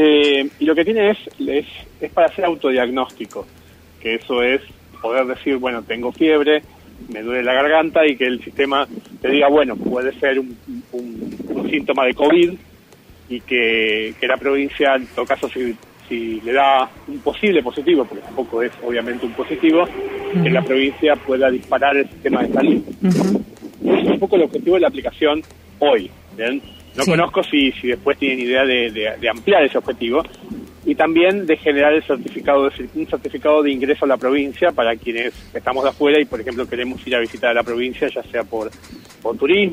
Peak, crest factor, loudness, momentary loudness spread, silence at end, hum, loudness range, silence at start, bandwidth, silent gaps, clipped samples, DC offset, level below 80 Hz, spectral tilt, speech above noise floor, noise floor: -4 dBFS; 14 dB; -18 LUFS; 12 LU; 0 s; none; 3 LU; 0 s; 15.5 kHz; none; under 0.1%; under 0.1%; -50 dBFS; -5.5 dB/octave; 28 dB; -46 dBFS